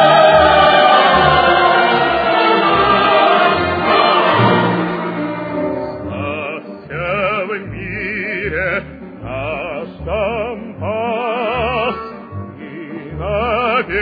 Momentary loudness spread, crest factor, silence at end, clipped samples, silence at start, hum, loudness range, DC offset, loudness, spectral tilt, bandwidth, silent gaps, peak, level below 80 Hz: 17 LU; 14 dB; 0 s; under 0.1%; 0 s; none; 10 LU; under 0.1%; -14 LUFS; -7.5 dB/octave; 5 kHz; none; 0 dBFS; -38 dBFS